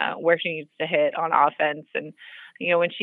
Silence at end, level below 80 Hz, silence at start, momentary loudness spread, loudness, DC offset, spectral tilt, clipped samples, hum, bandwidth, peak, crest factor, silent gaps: 0 s; -84 dBFS; 0 s; 15 LU; -23 LUFS; under 0.1%; -7.5 dB/octave; under 0.1%; none; 4.1 kHz; -4 dBFS; 20 dB; none